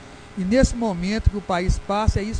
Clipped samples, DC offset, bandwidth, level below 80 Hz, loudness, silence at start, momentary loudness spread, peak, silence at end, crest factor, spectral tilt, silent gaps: under 0.1%; under 0.1%; 10 kHz; -28 dBFS; -22 LUFS; 0 s; 6 LU; -4 dBFS; 0 s; 18 dB; -6 dB/octave; none